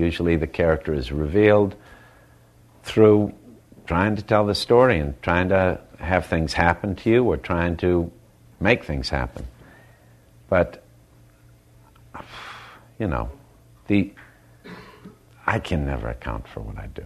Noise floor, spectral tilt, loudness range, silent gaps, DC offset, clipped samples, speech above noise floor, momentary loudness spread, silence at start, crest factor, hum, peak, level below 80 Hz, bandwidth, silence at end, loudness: -53 dBFS; -7 dB/octave; 10 LU; none; under 0.1%; under 0.1%; 32 dB; 21 LU; 0 s; 22 dB; none; 0 dBFS; -38 dBFS; 13 kHz; 0 s; -22 LUFS